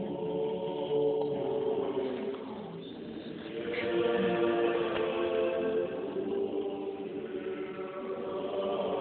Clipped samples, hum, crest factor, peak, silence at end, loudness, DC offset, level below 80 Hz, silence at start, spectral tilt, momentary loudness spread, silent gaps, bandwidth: under 0.1%; none; 16 dB; -16 dBFS; 0 s; -33 LUFS; under 0.1%; -68 dBFS; 0 s; -4.5 dB/octave; 11 LU; none; 4.4 kHz